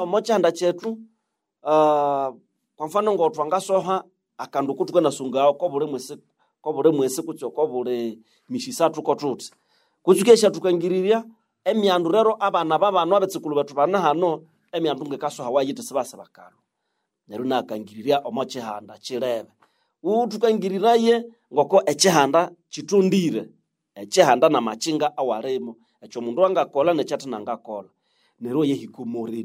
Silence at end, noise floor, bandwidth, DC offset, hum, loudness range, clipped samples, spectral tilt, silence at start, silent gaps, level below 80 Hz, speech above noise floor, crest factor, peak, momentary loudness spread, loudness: 0 s; -77 dBFS; 16 kHz; under 0.1%; none; 7 LU; under 0.1%; -4.5 dB/octave; 0 s; none; -76 dBFS; 56 dB; 20 dB; -2 dBFS; 14 LU; -22 LUFS